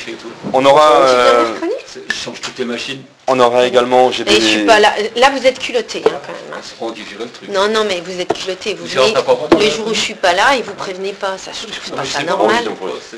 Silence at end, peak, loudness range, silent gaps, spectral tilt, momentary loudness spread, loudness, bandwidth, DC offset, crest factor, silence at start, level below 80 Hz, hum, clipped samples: 0 s; 0 dBFS; 6 LU; none; -3 dB/octave; 16 LU; -14 LUFS; 11 kHz; under 0.1%; 14 dB; 0 s; -50 dBFS; none; under 0.1%